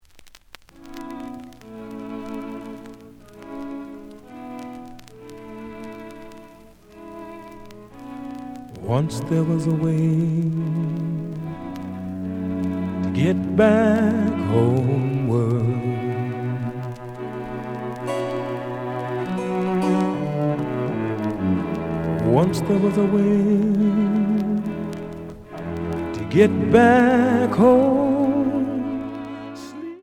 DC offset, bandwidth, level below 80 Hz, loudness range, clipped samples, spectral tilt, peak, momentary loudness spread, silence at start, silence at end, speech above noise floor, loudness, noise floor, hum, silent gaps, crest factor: under 0.1%; 14 kHz; -52 dBFS; 19 LU; under 0.1%; -8 dB/octave; 0 dBFS; 21 LU; 0.15 s; 0 s; 30 dB; -21 LUFS; -48 dBFS; none; none; 22 dB